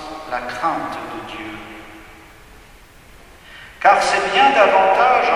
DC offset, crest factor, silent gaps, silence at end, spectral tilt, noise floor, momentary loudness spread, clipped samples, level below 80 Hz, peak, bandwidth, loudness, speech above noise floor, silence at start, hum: under 0.1%; 18 dB; none; 0 s; -3 dB/octave; -44 dBFS; 21 LU; under 0.1%; -48 dBFS; 0 dBFS; 14.5 kHz; -16 LUFS; 29 dB; 0 s; none